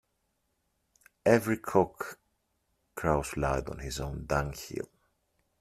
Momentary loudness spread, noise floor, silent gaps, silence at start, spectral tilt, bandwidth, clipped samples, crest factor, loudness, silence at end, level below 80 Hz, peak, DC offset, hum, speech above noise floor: 15 LU; -78 dBFS; none; 1.25 s; -6 dB/octave; 15.5 kHz; under 0.1%; 24 dB; -31 LUFS; 0.75 s; -48 dBFS; -8 dBFS; under 0.1%; none; 48 dB